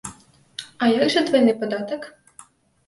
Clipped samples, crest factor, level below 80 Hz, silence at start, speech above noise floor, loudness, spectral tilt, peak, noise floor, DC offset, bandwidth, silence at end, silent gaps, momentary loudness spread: under 0.1%; 16 dB; -62 dBFS; 0.05 s; 31 dB; -20 LUFS; -4.5 dB/octave; -6 dBFS; -50 dBFS; under 0.1%; 11.5 kHz; 0.45 s; none; 20 LU